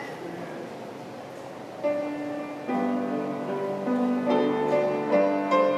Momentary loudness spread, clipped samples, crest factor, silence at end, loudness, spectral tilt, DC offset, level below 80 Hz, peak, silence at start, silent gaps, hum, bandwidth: 16 LU; under 0.1%; 16 dB; 0 s; -27 LUFS; -6.5 dB/octave; under 0.1%; -74 dBFS; -10 dBFS; 0 s; none; none; 13 kHz